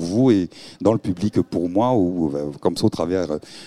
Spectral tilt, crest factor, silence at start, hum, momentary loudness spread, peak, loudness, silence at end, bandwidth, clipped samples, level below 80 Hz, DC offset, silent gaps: -7.5 dB/octave; 16 dB; 0 s; none; 6 LU; -4 dBFS; -21 LUFS; 0 s; 13 kHz; under 0.1%; -52 dBFS; 0.2%; none